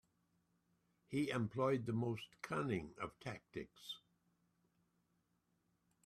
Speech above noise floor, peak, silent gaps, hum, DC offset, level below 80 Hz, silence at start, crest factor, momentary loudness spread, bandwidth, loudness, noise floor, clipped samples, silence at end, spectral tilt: 40 dB; -26 dBFS; none; none; under 0.1%; -76 dBFS; 1.1 s; 20 dB; 13 LU; 13.5 kHz; -43 LUFS; -82 dBFS; under 0.1%; 2.05 s; -6.5 dB/octave